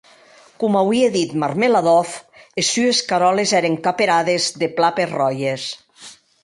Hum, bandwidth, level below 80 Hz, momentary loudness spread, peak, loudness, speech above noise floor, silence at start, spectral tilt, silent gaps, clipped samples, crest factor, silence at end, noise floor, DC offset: none; 11.5 kHz; -64 dBFS; 10 LU; -4 dBFS; -18 LUFS; 31 dB; 0.6 s; -3.5 dB/octave; none; under 0.1%; 16 dB; 0.3 s; -48 dBFS; under 0.1%